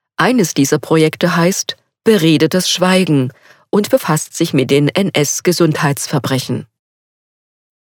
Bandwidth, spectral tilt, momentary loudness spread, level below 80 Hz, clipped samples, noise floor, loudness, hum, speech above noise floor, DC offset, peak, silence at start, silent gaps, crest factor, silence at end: 19.5 kHz; -4.5 dB/octave; 7 LU; -60 dBFS; under 0.1%; under -90 dBFS; -14 LUFS; none; over 77 dB; under 0.1%; 0 dBFS; 0.2 s; none; 14 dB; 1.25 s